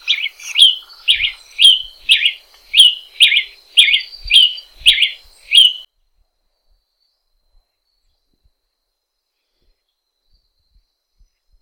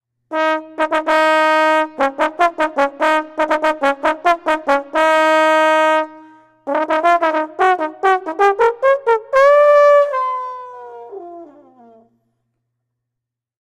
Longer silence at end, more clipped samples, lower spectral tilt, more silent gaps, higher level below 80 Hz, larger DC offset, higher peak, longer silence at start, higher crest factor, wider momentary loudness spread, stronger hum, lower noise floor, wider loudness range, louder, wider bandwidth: first, 5.8 s vs 2.2 s; neither; second, 4.5 dB/octave vs -2.5 dB/octave; neither; first, -48 dBFS vs -58 dBFS; neither; about the same, 0 dBFS vs -2 dBFS; second, 0.05 s vs 0.3 s; about the same, 18 dB vs 14 dB; second, 9 LU vs 14 LU; neither; second, -74 dBFS vs -82 dBFS; first, 6 LU vs 3 LU; first, -11 LUFS vs -15 LUFS; first, over 20 kHz vs 13 kHz